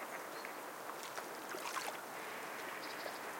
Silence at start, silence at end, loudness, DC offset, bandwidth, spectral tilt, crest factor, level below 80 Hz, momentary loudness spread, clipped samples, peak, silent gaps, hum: 0 s; 0 s; -45 LUFS; under 0.1%; 17 kHz; -1.5 dB/octave; 18 dB; under -90 dBFS; 4 LU; under 0.1%; -26 dBFS; none; none